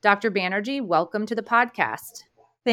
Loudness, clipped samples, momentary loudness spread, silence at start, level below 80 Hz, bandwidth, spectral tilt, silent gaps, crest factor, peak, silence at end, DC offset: -24 LUFS; under 0.1%; 9 LU; 0.05 s; -74 dBFS; 18 kHz; -4.5 dB/octave; none; 22 dB; -2 dBFS; 0 s; under 0.1%